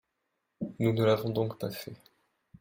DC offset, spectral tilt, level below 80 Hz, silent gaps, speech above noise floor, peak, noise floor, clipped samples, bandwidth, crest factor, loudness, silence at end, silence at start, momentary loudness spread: under 0.1%; -7 dB/octave; -66 dBFS; none; 52 dB; -14 dBFS; -81 dBFS; under 0.1%; 16.5 kHz; 18 dB; -30 LUFS; 0.65 s; 0.6 s; 15 LU